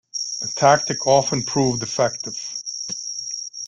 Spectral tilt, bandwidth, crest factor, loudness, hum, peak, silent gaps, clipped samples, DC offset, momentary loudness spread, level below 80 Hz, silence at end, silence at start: -3.5 dB/octave; 11 kHz; 20 dB; -21 LUFS; none; -2 dBFS; none; under 0.1%; under 0.1%; 11 LU; -58 dBFS; 0 s; 0.15 s